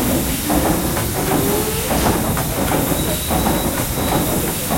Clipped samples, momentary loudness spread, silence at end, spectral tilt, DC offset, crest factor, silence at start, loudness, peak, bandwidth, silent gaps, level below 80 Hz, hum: under 0.1%; 2 LU; 0 s; -4 dB/octave; under 0.1%; 16 dB; 0 s; -18 LUFS; -2 dBFS; 16.5 kHz; none; -30 dBFS; none